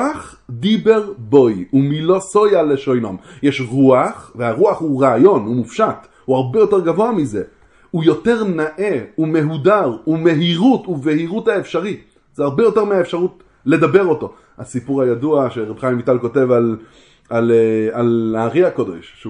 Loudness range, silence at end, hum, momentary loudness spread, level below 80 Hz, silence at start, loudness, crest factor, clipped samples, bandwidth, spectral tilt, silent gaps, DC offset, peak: 2 LU; 0 s; none; 10 LU; -54 dBFS; 0 s; -16 LUFS; 16 dB; under 0.1%; 10.5 kHz; -7 dB/octave; none; under 0.1%; 0 dBFS